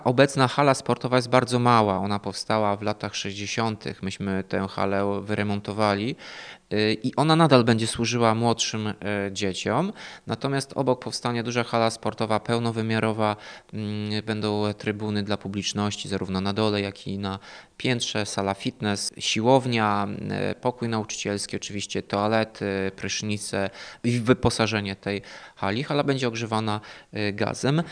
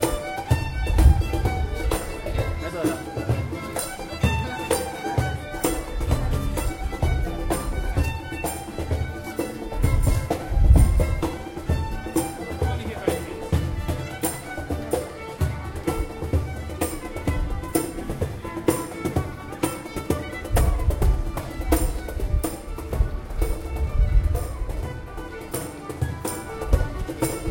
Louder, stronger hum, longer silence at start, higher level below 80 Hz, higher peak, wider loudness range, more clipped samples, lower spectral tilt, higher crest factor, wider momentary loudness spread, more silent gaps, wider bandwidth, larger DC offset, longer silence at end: about the same, -25 LUFS vs -26 LUFS; neither; about the same, 0 s vs 0 s; second, -58 dBFS vs -26 dBFS; about the same, -2 dBFS vs -4 dBFS; about the same, 5 LU vs 5 LU; neither; about the same, -5 dB/octave vs -6 dB/octave; about the same, 24 dB vs 20 dB; about the same, 10 LU vs 8 LU; neither; second, 10.5 kHz vs 17 kHz; neither; about the same, 0 s vs 0 s